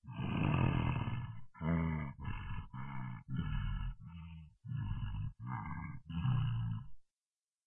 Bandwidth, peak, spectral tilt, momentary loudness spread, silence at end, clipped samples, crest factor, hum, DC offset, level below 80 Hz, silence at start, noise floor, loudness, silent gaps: 3.5 kHz; -20 dBFS; -10 dB/octave; 13 LU; 0.65 s; under 0.1%; 18 dB; none; under 0.1%; -48 dBFS; 0.05 s; under -90 dBFS; -40 LUFS; none